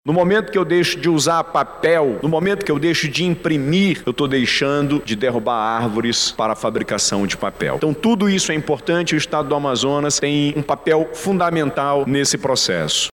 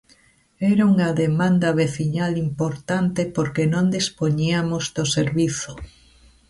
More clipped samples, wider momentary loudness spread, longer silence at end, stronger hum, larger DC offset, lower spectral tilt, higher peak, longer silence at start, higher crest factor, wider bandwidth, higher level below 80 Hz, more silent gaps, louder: neither; about the same, 4 LU vs 6 LU; second, 0 s vs 0.6 s; neither; neither; second, -4 dB/octave vs -5.5 dB/octave; about the same, -6 dBFS vs -8 dBFS; second, 0.05 s vs 0.6 s; about the same, 12 dB vs 12 dB; first, 17 kHz vs 11.5 kHz; about the same, -48 dBFS vs -50 dBFS; neither; first, -18 LUFS vs -21 LUFS